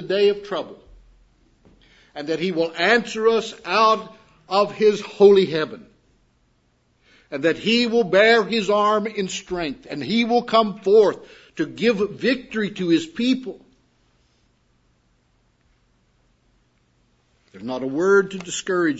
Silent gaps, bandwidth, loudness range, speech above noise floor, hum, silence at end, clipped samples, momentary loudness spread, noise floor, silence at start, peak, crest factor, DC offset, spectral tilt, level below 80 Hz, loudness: none; 8 kHz; 7 LU; 44 dB; none; 0 s; under 0.1%; 14 LU; -64 dBFS; 0 s; -2 dBFS; 20 dB; under 0.1%; -4.5 dB/octave; -60 dBFS; -20 LUFS